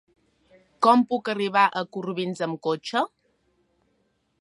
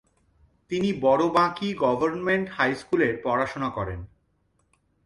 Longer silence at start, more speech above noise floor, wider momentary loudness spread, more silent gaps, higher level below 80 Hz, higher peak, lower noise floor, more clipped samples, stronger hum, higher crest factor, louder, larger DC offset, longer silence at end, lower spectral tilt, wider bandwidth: about the same, 0.8 s vs 0.7 s; about the same, 47 dB vs 45 dB; about the same, 11 LU vs 10 LU; neither; second, -76 dBFS vs -52 dBFS; about the same, -6 dBFS vs -8 dBFS; about the same, -70 dBFS vs -69 dBFS; neither; neither; about the same, 20 dB vs 18 dB; about the same, -24 LUFS vs -25 LUFS; neither; first, 1.35 s vs 1 s; about the same, -5.5 dB/octave vs -6.5 dB/octave; about the same, 11.5 kHz vs 11.5 kHz